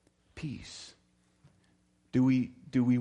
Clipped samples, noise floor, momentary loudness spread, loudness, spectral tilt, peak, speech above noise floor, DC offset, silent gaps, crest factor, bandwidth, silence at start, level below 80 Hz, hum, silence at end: under 0.1%; -69 dBFS; 21 LU; -31 LUFS; -7.5 dB/octave; -18 dBFS; 40 dB; under 0.1%; none; 16 dB; 9.4 kHz; 0.35 s; -64 dBFS; 60 Hz at -65 dBFS; 0 s